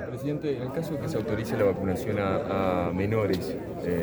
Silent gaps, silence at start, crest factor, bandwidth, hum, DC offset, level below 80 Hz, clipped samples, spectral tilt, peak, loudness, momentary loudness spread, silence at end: none; 0 s; 16 dB; over 20 kHz; none; under 0.1%; -50 dBFS; under 0.1%; -7.5 dB/octave; -12 dBFS; -28 LUFS; 6 LU; 0 s